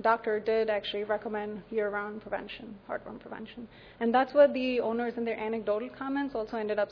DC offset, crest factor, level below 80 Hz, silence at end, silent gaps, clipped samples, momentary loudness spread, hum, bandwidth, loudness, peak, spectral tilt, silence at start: under 0.1%; 20 dB; -64 dBFS; 0 s; none; under 0.1%; 18 LU; none; 5.4 kHz; -30 LUFS; -10 dBFS; -7 dB/octave; 0 s